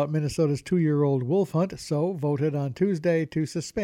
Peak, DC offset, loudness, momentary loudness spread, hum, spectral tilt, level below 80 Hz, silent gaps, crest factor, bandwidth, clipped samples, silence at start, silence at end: -12 dBFS; under 0.1%; -26 LUFS; 4 LU; none; -7.5 dB/octave; -58 dBFS; none; 12 dB; 13 kHz; under 0.1%; 0 s; 0 s